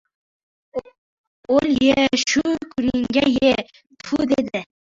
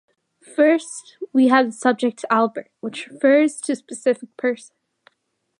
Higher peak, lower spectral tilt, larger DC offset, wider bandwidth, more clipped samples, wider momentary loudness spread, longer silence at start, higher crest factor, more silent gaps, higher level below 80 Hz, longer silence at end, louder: about the same, -2 dBFS vs -2 dBFS; about the same, -4 dB/octave vs -4 dB/octave; neither; second, 7.6 kHz vs 11.5 kHz; neither; about the same, 16 LU vs 15 LU; first, 0.75 s vs 0.6 s; about the same, 18 dB vs 18 dB; first, 0.98-1.44 s vs none; first, -50 dBFS vs -80 dBFS; second, 0.3 s vs 1.05 s; about the same, -19 LUFS vs -19 LUFS